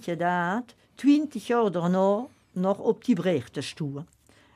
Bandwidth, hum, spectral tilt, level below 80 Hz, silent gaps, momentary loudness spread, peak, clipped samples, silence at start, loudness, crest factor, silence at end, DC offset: 12.5 kHz; none; -7 dB/octave; -70 dBFS; none; 12 LU; -10 dBFS; under 0.1%; 0.05 s; -26 LUFS; 16 dB; 0.5 s; under 0.1%